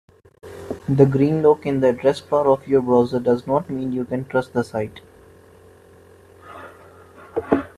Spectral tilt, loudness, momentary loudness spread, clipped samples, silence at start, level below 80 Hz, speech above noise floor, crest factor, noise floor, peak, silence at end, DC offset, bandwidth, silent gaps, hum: -8.5 dB/octave; -20 LUFS; 17 LU; under 0.1%; 0.45 s; -56 dBFS; 30 dB; 20 dB; -48 dBFS; 0 dBFS; 0.1 s; under 0.1%; 13 kHz; none; none